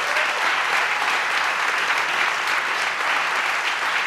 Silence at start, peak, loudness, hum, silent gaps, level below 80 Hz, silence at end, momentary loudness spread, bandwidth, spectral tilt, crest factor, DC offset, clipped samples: 0 s; -8 dBFS; -20 LUFS; none; none; -72 dBFS; 0 s; 2 LU; 16 kHz; 0.5 dB/octave; 14 dB; under 0.1%; under 0.1%